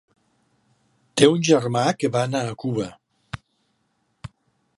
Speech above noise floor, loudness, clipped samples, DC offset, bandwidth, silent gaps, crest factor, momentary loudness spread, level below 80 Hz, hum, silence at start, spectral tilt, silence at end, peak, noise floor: 50 dB; -21 LUFS; under 0.1%; under 0.1%; 11.5 kHz; none; 24 dB; 25 LU; -58 dBFS; none; 1.15 s; -5 dB/octave; 0.5 s; 0 dBFS; -70 dBFS